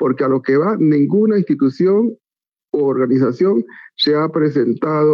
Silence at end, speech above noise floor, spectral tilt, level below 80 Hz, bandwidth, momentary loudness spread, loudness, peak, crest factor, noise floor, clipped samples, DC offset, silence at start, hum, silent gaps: 0 s; over 75 dB; -8.5 dB/octave; -68 dBFS; 6.8 kHz; 5 LU; -16 LUFS; -6 dBFS; 10 dB; under -90 dBFS; under 0.1%; under 0.1%; 0 s; none; none